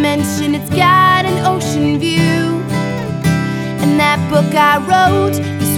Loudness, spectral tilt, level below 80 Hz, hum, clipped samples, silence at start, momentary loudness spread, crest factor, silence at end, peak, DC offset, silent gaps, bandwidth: -13 LUFS; -5.5 dB/octave; -44 dBFS; none; under 0.1%; 0 s; 7 LU; 12 dB; 0 s; -2 dBFS; under 0.1%; none; 17.5 kHz